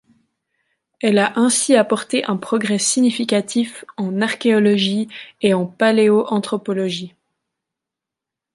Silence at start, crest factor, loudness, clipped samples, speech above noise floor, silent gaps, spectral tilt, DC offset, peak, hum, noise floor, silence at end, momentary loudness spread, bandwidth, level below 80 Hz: 1.05 s; 18 dB; -18 LUFS; under 0.1%; 68 dB; none; -4 dB/octave; under 0.1%; -2 dBFS; none; -85 dBFS; 1.45 s; 9 LU; 11.5 kHz; -66 dBFS